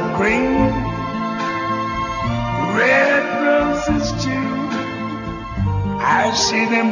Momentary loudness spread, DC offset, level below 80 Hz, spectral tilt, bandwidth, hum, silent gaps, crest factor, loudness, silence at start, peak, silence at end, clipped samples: 9 LU; under 0.1%; -34 dBFS; -5 dB/octave; 7.4 kHz; none; none; 16 dB; -18 LUFS; 0 s; -2 dBFS; 0 s; under 0.1%